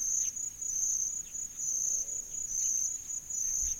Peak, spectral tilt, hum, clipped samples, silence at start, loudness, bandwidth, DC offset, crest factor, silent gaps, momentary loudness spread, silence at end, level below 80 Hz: -20 dBFS; 0.5 dB/octave; none; under 0.1%; 0 s; -31 LUFS; 16.5 kHz; under 0.1%; 14 dB; none; 6 LU; 0 s; -56 dBFS